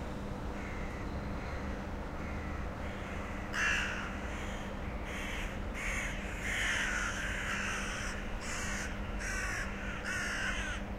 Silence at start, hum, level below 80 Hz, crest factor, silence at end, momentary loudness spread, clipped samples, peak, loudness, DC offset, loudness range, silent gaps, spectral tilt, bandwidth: 0 s; none; -42 dBFS; 16 dB; 0 s; 9 LU; under 0.1%; -20 dBFS; -37 LUFS; under 0.1%; 2 LU; none; -3.5 dB/octave; 16 kHz